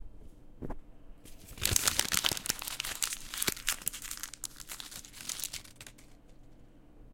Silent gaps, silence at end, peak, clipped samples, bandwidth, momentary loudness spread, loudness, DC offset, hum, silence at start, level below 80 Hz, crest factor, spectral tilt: none; 0 s; -6 dBFS; under 0.1%; 17 kHz; 22 LU; -33 LUFS; under 0.1%; none; 0 s; -52 dBFS; 32 dB; -0.5 dB/octave